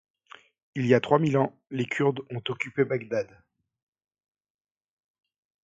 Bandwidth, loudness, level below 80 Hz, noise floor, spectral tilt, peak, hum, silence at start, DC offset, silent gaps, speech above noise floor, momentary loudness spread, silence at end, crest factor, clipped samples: 7.8 kHz; -27 LUFS; -68 dBFS; -54 dBFS; -7 dB/octave; -6 dBFS; none; 0.75 s; under 0.1%; none; 28 dB; 12 LU; 2.4 s; 24 dB; under 0.1%